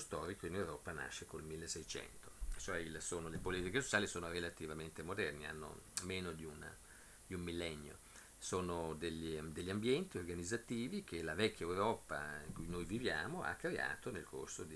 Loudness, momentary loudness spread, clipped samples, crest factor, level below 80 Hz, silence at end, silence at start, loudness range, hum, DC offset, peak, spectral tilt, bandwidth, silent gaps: -43 LUFS; 11 LU; under 0.1%; 26 dB; -60 dBFS; 0 s; 0 s; 5 LU; none; under 0.1%; -18 dBFS; -4 dB/octave; 11 kHz; none